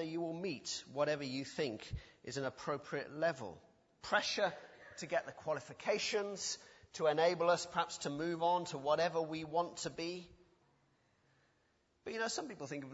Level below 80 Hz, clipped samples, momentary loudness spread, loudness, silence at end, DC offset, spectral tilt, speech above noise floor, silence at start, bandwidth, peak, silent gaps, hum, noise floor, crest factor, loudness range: -66 dBFS; under 0.1%; 13 LU; -38 LUFS; 0 s; under 0.1%; -2.5 dB/octave; 38 dB; 0 s; 7.6 kHz; -18 dBFS; none; none; -77 dBFS; 20 dB; 6 LU